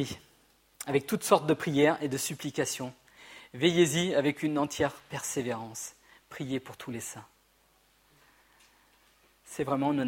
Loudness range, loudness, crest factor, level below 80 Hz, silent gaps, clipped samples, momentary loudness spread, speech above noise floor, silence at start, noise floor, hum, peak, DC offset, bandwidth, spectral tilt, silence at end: 14 LU; -30 LUFS; 24 dB; -66 dBFS; none; under 0.1%; 18 LU; 37 dB; 0 s; -66 dBFS; 50 Hz at -60 dBFS; -8 dBFS; under 0.1%; 16.5 kHz; -4.5 dB/octave; 0 s